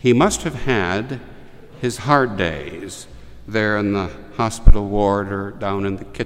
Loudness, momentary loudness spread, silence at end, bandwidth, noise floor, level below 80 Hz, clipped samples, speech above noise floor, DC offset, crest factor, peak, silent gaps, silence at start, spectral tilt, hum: -20 LUFS; 14 LU; 0 s; 12.5 kHz; -39 dBFS; -22 dBFS; 0.3%; 22 dB; under 0.1%; 18 dB; 0 dBFS; none; 0.05 s; -5.5 dB/octave; none